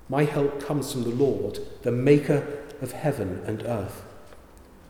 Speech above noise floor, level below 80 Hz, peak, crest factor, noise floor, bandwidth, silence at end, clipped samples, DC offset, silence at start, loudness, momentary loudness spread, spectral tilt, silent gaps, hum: 24 dB; -54 dBFS; -6 dBFS; 20 dB; -49 dBFS; 18 kHz; 0 s; under 0.1%; under 0.1%; 0.05 s; -26 LUFS; 15 LU; -7 dB/octave; none; none